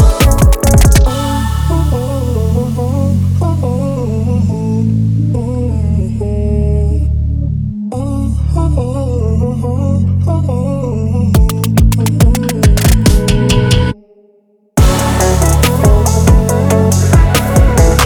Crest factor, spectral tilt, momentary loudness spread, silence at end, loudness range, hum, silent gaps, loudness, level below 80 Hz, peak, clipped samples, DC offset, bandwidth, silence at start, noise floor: 10 dB; -6 dB/octave; 7 LU; 0 s; 4 LU; none; none; -12 LUFS; -14 dBFS; 0 dBFS; under 0.1%; under 0.1%; 20 kHz; 0 s; -51 dBFS